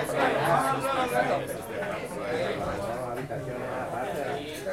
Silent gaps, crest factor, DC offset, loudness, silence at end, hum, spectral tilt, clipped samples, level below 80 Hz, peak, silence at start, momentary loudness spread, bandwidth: none; 18 dB; under 0.1%; -29 LUFS; 0 s; none; -5 dB/octave; under 0.1%; -54 dBFS; -12 dBFS; 0 s; 9 LU; 16.5 kHz